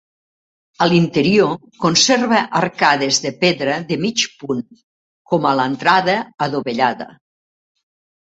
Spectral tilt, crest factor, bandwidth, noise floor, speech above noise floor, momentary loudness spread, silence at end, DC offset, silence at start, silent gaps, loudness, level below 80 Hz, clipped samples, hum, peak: -4 dB/octave; 18 dB; 8.2 kHz; under -90 dBFS; over 73 dB; 8 LU; 1.3 s; under 0.1%; 0.8 s; 4.83-5.25 s; -16 LUFS; -58 dBFS; under 0.1%; none; 0 dBFS